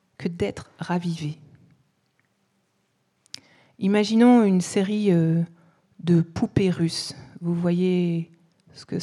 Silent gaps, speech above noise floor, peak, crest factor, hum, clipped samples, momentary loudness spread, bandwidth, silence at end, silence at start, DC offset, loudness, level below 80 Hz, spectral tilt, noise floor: none; 49 dB; -6 dBFS; 18 dB; none; under 0.1%; 18 LU; 11.5 kHz; 0 s; 0.2 s; under 0.1%; -23 LUFS; -58 dBFS; -7 dB/octave; -70 dBFS